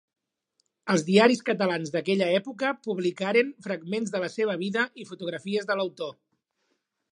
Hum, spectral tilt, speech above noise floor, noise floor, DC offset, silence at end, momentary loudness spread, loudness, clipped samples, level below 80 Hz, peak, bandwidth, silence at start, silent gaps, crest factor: none; -5 dB/octave; 50 dB; -76 dBFS; under 0.1%; 1 s; 13 LU; -26 LUFS; under 0.1%; -78 dBFS; -6 dBFS; 11 kHz; 0.85 s; none; 22 dB